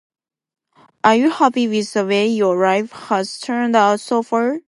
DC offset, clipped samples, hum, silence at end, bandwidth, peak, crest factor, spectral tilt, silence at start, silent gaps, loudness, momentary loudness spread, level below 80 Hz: under 0.1%; under 0.1%; none; 0.1 s; 11.5 kHz; 0 dBFS; 18 dB; -5 dB/octave; 1.05 s; none; -17 LUFS; 7 LU; -70 dBFS